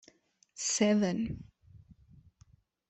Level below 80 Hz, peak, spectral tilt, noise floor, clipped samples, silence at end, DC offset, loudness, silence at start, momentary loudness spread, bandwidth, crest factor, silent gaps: -62 dBFS; -14 dBFS; -4 dB/octave; -65 dBFS; under 0.1%; 1.15 s; under 0.1%; -30 LUFS; 0.55 s; 18 LU; 8.4 kHz; 20 dB; none